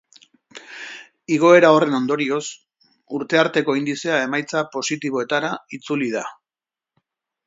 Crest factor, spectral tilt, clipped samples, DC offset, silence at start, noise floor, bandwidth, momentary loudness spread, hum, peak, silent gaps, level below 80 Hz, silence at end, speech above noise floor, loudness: 20 dB; -4.5 dB/octave; under 0.1%; under 0.1%; 0.55 s; under -90 dBFS; 7.8 kHz; 21 LU; none; 0 dBFS; none; -72 dBFS; 1.15 s; over 71 dB; -19 LUFS